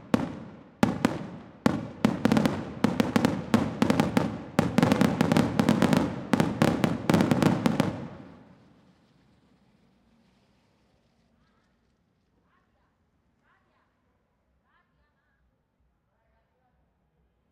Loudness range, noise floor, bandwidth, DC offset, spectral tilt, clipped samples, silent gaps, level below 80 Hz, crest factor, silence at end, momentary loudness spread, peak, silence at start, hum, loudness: 5 LU; -72 dBFS; 16.5 kHz; under 0.1%; -6.5 dB/octave; under 0.1%; none; -56 dBFS; 26 dB; 9.25 s; 7 LU; -4 dBFS; 0.05 s; none; -26 LUFS